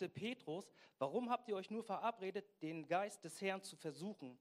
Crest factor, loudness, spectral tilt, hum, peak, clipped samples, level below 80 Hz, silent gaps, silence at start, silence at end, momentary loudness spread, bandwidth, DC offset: 18 dB; -45 LUFS; -5 dB/octave; none; -26 dBFS; under 0.1%; under -90 dBFS; none; 0 s; 0.05 s; 8 LU; 15.5 kHz; under 0.1%